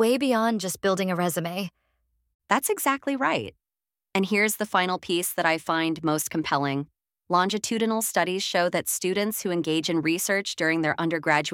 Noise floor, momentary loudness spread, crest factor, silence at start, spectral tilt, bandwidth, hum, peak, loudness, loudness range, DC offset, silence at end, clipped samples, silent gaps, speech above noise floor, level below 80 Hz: under -90 dBFS; 5 LU; 20 dB; 0 s; -3.5 dB/octave; 18 kHz; none; -6 dBFS; -25 LUFS; 2 LU; under 0.1%; 0 s; under 0.1%; 2.34-2.39 s; over 65 dB; -68 dBFS